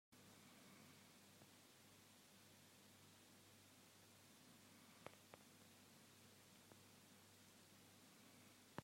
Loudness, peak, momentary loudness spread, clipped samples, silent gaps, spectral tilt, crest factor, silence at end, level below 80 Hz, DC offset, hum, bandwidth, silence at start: -66 LUFS; -34 dBFS; 4 LU; under 0.1%; none; -3 dB/octave; 34 dB; 0 s; under -90 dBFS; under 0.1%; none; 16 kHz; 0.1 s